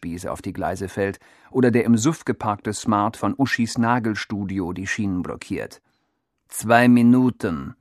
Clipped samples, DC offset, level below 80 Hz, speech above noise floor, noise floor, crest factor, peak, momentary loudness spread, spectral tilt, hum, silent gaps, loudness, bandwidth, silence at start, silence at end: under 0.1%; under 0.1%; -52 dBFS; 52 dB; -73 dBFS; 22 dB; 0 dBFS; 14 LU; -6 dB/octave; none; none; -21 LUFS; 13.5 kHz; 0 s; 0.1 s